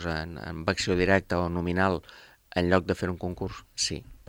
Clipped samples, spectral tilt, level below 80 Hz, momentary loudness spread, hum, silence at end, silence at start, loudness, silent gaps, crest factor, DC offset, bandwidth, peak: under 0.1%; -4.5 dB/octave; -50 dBFS; 10 LU; none; 0.1 s; 0 s; -28 LUFS; none; 22 dB; under 0.1%; 16.5 kHz; -8 dBFS